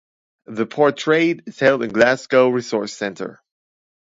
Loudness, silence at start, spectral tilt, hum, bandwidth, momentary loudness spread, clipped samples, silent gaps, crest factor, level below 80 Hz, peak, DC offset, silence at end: -18 LUFS; 0.5 s; -5 dB/octave; none; 8 kHz; 11 LU; under 0.1%; none; 20 dB; -64 dBFS; 0 dBFS; under 0.1%; 0.8 s